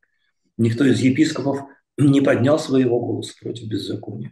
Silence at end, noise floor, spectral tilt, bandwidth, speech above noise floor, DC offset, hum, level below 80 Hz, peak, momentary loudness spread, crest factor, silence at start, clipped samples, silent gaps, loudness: 0 s; -70 dBFS; -6.5 dB/octave; 12 kHz; 51 dB; under 0.1%; none; -62 dBFS; -4 dBFS; 13 LU; 14 dB; 0.6 s; under 0.1%; none; -19 LUFS